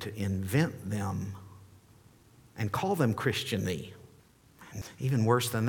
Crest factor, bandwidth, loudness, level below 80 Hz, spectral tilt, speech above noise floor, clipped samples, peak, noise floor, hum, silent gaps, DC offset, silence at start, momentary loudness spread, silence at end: 20 dB; 19 kHz; -31 LUFS; -62 dBFS; -5.5 dB/octave; 29 dB; under 0.1%; -12 dBFS; -60 dBFS; none; none; under 0.1%; 0 s; 19 LU; 0 s